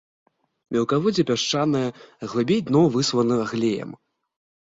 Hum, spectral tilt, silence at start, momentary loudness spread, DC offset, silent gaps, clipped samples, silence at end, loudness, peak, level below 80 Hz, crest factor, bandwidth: none; -5.5 dB/octave; 0.7 s; 11 LU; under 0.1%; none; under 0.1%; 0.7 s; -22 LUFS; -8 dBFS; -60 dBFS; 16 dB; 7.8 kHz